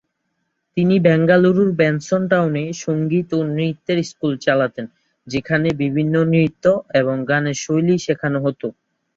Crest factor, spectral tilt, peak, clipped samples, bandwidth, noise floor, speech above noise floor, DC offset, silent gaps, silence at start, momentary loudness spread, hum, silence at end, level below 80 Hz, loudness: 16 dB; -6.5 dB/octave; -2 dBFS; under 0.1%; 7.8 kHz; -72 dBFS; 55 dB; under 0.1%; none; 0.75 s; 9 LU; none; 0.45 s; -56 dBFS; -18 LUFS